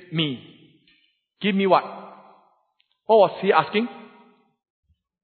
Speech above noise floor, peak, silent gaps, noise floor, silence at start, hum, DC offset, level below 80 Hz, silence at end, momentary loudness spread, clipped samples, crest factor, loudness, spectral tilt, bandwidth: 49 dB; -4 dBFS; none; -69 dBFS; 0.1 s; none; under 0.1%; -74 dBFS; 1.25 s; 20 LU; under 0.1%; 22 dB; -21 LUFS; -10 dB/octave; 4.5 kHz